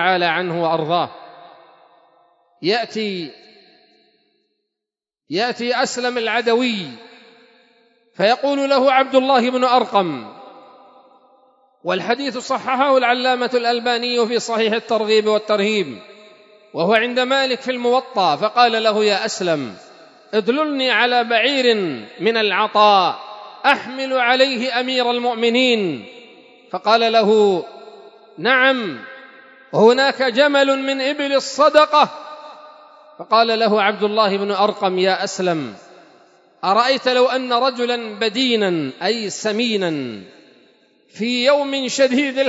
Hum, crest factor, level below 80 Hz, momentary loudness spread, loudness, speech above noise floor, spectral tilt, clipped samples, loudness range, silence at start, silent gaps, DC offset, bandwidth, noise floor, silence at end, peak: none; 18 dB; -76 dBFS; 11 LU; -17 LUFS; 70 dB; -4 dB/octave; under 0.1%; 5 LU; 0 s; none; under 0.1%; 8 kHz; -87 dBFS; 0 s; 0 dBFS